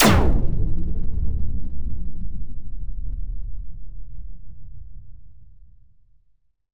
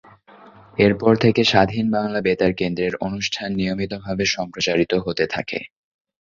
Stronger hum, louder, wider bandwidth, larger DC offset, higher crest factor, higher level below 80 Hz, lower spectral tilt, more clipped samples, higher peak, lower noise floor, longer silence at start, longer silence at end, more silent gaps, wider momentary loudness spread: neither; second, -28 LUFS vs -20 LUFS; first, over 20 kHz vs 7.6 kHz; first, 4% vs under 0.1%; about the same, 18 dB vs 18 dB; first, -28 dBFS vs -48 dBFS; about the same, -5 dB/octave vs -5 dB/octave; neither; about the same, -2 dBFS vs -2 dBFS; first, -62 dBFS vs -47 dBFS; second, 0 s vs 0.45 s; second, 0 s vs 0.55 s; neither; first, 21 LU vs 10 LU